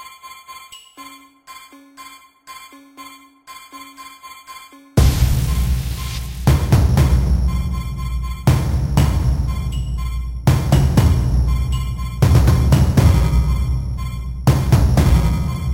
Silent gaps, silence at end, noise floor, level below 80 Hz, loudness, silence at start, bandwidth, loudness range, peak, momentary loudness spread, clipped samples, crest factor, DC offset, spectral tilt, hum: none; 0 s; -41 dBFS; -20 dBFS; -17 LUFS; 0 s; 16.5 kHz; 22 LU; -2 dBFS; 24 LU; under 0.1%; 14 dB; under 0.1%; -6.5 dB/octave; none